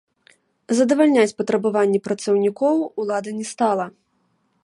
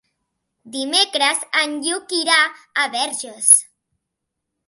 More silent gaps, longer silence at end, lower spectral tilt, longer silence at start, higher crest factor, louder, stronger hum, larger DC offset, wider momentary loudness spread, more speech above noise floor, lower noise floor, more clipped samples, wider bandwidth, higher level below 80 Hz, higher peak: neither; second, 0.75 s vs 1.05 s; first, -5.5 dB/octave vs 2 dB/octave; about the same, 0.7 s vs 0.65 s; about the same, 16 dB vs 20 dB; second, -20 LUFS vs -16 LUFS; neither; neither; about the same, 9 LU vs 11 LU; second, 48 dB vs 60 dB; second, -67 dBFS vs -79 dBFS; neither; second, 11.5 kHz vs 16 kHz; first, -70 dBFS vs -80 dBFS; second, -4 dBFS vs 0 dBFS